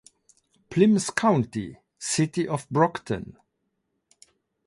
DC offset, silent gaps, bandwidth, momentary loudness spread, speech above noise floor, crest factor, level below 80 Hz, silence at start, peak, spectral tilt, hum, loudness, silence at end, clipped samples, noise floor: under 0.1%; none; 11.5 kHz; 14 LU; 53 dB; 20 dB; -60 dBFS; 0.7 s; -6 dBFS; -5.5 dB/octave; none; -25 LUFS; 1.35 s; under 0.1%; -77 dBFS